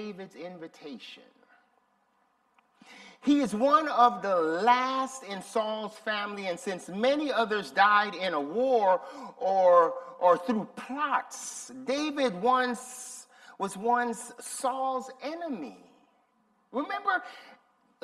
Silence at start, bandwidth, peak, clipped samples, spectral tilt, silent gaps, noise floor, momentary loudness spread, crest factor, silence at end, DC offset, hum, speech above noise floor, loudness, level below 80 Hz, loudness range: 0 s; 14 kHz; -8 dBFS; under 0.1%; -3.5 dB/octave; none; -70 dBFS; 18 LU; 22 dB; 0.5 s; under 0.1%; none; 42 dB; -28 LUFS; -78 dBFS; 9 LU